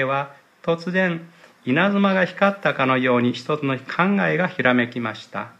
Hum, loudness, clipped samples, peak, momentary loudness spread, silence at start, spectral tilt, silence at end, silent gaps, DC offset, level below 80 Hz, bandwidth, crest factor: none; -21 LUFS; under 0.1%; -4 dBFS; 10 LU; 0 s; -7 dB/octave; 0.1 s; none; under 0.1%; -68 dBFS; 8.6 kHz; 18 dB